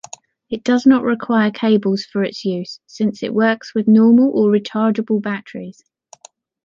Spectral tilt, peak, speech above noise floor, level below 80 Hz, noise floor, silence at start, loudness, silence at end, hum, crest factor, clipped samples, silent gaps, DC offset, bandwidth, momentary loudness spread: -6.5 dB/octave; -2 dBFS; 30 dB; -64 dBFS; -46 dBFS; 0.5 s; -16 LUFS; 0.95 s; none; 14 dB; under 0.1%; none; under 0.1%; 7.4 kHz; 15 LU